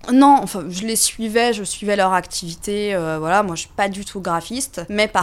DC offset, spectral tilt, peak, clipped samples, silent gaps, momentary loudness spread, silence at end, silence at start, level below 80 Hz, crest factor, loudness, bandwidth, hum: under 0.1%; -3.5 dB/octave; -2 dBFS; under 0.1%; none; 11 LU; 0 s; 0.05 s; -46 dBFS; 18 dB; -19 LUFS; 16 kHz; none